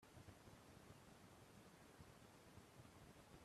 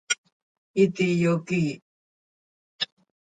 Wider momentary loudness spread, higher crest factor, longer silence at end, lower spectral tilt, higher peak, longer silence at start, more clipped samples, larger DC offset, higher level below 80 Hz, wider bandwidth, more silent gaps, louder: second, 1 LU vs 10 LU; about the same, 18 dB vs 20 dB; second, 0 s vs 0.4 s; about the same, -4.5 dB/octave vs -5 dB/octave; second, -48 dBFS vs -8 dBFS; about the same, 0 s vs 0.1 s; neither; neither; second, -78 dBFS vs -66 dBFS; first, 14.5 kHz vs 9.2 kHz; second, none vs 0.18-0.24 s, 0.32-0.74 s, 1.82-2.79 s; second, -65 LUFS vs -25 LUFS